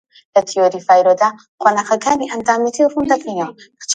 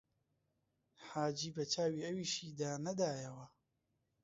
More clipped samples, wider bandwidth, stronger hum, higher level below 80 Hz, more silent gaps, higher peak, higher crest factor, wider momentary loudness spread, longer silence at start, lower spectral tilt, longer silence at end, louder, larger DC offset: neither; first, 9.4 kHz vs 7.6 kHz; neither; first, -56 dBFS vs -80 dBFS; first, 1.48-1.58 s vs none; first, 0 dBFS vs -24 dBFS; about the same, 16 dB vs 18 dB; about the same, 9 LU vs 11 LU; second, 0.35 s vs 1 s; second, -3 dB/octave vs -4.5 dB/octave; second, 0 s vs 0.75 s; first, -15 LUFS vs -40 LUFS; neither